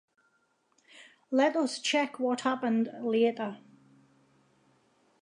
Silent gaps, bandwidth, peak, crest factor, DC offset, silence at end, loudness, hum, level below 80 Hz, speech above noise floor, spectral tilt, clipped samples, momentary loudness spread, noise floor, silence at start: none; 11 kHz; -14 dBFS; 18 dB; under 0.1%; 1.65 s; -29 LUFS; none; -88 dBFS; 44 dB; -4 dB/octave; under 0.1%; 8 LU; -72 dBFS; 0.95 s